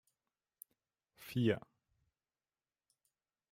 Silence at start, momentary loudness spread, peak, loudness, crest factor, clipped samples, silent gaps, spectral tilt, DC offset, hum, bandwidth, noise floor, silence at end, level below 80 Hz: 1.2 s; 24 LU; -20 dBFS; -38 LUFS; 24 dB; under 0.1%; none; -7 dB/octave; under 0.1%; none; 16 kHz; under -90 dBFS; 1.9 s; -80 dBFS